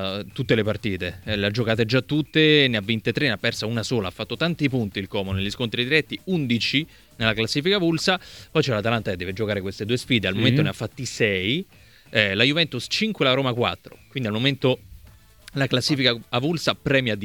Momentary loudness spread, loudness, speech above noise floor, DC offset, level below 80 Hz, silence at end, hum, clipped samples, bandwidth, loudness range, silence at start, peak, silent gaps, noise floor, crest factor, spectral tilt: 9 LU; -22 LUFS; 27 dB; under 0.1%; -52 dBFS; 0 s; none; under 0.1%; 18.5 kHz; 3 LU; 0 s; -2 dBFS; none; -50 dBFS; 22 dB; -5 dB/octave